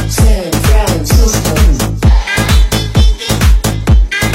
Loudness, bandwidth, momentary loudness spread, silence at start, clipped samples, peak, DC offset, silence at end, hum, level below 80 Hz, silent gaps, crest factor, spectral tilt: -11 LUFS; 16.5 kHz; 2 LU; 0 s; under 0.1%; 0 dBFS; under 0.1%; 0 s; none; -10 dBFS; none; 8 dB; -4.5 dB/octave